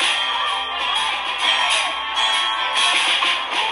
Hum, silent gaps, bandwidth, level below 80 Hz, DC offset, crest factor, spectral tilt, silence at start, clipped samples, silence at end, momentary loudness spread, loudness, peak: none; none; 12.5 kHz; -58 dBFS; under 0.1%; 16 dB; 1.5 dB/octave; 0 s; under 0.1%; 0 s; 5 LU; -18 LUFS; -4 dBFS